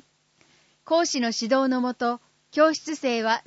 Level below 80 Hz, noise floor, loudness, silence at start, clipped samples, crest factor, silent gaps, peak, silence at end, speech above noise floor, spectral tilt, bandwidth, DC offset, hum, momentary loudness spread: -78 dBFS; -63 dBFS; -24 LUFS; 0.85 s; under 0.1%; 18 dB; none; -8 dBFS; 0.05 s; 39 dB; -2.5 dB/octave; 8 kHz; under 0.1%; none; 7 LU